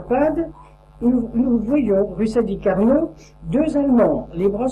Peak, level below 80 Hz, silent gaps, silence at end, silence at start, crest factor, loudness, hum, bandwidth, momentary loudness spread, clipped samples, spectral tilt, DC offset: -6 dBFS; -40 dBFS; none; 0 s; 0 s; 14 dB; -19 LUFS; none; 9.6 kHz; 7 LU; under 0.1%; -8.5 dB/octave; under 0.1%